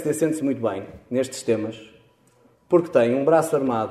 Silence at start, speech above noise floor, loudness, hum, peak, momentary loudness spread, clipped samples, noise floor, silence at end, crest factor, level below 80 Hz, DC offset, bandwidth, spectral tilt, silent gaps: 0 s; 37 dB; -22 LUFS; none; -4 dBFS; 10 LU; under 0.1%; -58 dBFS; 0 s; 18 dB; -62 dBFS; under 0.1%; 14 kHz; -6 dB/octave; none